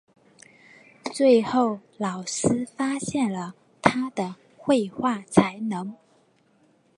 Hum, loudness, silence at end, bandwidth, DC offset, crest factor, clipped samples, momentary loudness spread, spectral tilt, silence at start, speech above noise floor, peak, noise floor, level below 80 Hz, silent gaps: none; -25 LUFS; 1.05 s; 11.5 kHz; under 0.1%; 24 dB; under 0.1%; 14 LU; -5 dB/octave; 1.05 s; 38 dB; 0 dBFS; -62 dBFS; -60 dBFS; none